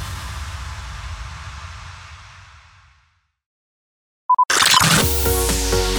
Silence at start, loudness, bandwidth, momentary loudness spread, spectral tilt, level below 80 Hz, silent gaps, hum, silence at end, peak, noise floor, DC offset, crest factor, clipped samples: 0 s; -15 LUFS; over 20 kHz; 23 LU; -2.5 dB/octave; -30 dBFS; 3.46-4.29 s; none; 0 s; -2 dBFS; -62 dBFS; under 0.1%; 20 dB; under 0.1%